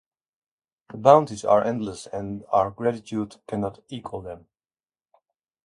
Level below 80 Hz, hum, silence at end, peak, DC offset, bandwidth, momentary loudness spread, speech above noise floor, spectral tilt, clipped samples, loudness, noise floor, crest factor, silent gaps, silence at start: -58 dBFS; none; 1.25 s; 0 dBFS; under 0.1%; 11.5 kHz; 20 LU; over 67 dB; -6.5 dB/octave; under 0.1%; -23 LUFS; under -90 dBFS; 24 dB; none; 0.95 s